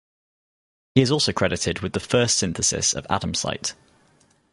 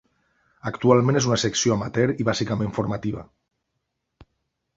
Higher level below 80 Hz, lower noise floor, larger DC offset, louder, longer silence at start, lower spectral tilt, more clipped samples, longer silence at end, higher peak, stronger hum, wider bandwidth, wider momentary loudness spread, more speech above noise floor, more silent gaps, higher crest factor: first, -46 dBFS vs -52 dBFS; second, -60 dBFS vs -78 dBFS; neither; about the same, -22 LUFS vs -22 LUFS; first, 0.95 s vs 0.65 s; second, -3.5 dB/octave vs -5 dB/octave; neither; second, 0.8 s vs 1.55 s; about the same, -4 dBFS vs -2 dBFS; neither; first, 11.5 kHz vs 7.8 kHz; second, 8 LU vs 13 LU; second, 38 dB vs 56 dB; neither; about the same, 22 dB vs 22 dB